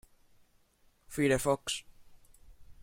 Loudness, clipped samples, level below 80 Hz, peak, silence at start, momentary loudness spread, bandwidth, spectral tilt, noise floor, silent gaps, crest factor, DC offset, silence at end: -32 LUFS; under 0.1%; -56 dBFS; -14 dBFS; 1.1 s; 11 LU; 16.5 kHz; -4 dB/octave; -68 dBFS; none; 22 dB; under 0.1%; 0.1 s